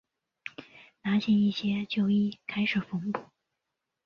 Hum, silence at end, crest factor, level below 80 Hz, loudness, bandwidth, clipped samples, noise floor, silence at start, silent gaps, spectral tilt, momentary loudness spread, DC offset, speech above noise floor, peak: none; 0.8 s; 16 dB; -68 dBFS; -29 LUFS; 6.6 kHz; under 0.1%; -85 dBFS; 0.45 s; none; -7 dB/octave; 18 LU; under 0.1%; 58 dB; -14 dBFS